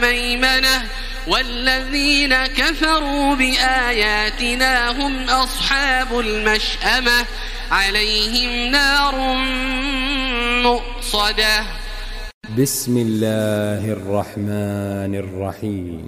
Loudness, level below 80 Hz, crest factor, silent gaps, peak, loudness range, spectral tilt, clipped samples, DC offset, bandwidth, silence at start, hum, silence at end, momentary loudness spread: -17 LUFS; -28 dBFS; 16 dB; 12.34-12.41 s; -2 dBFS; 5 LU; -3 dB/octave; under 0.1%; under 0.1%; 16 kHz; 0 s; none; 0 s; 10 LU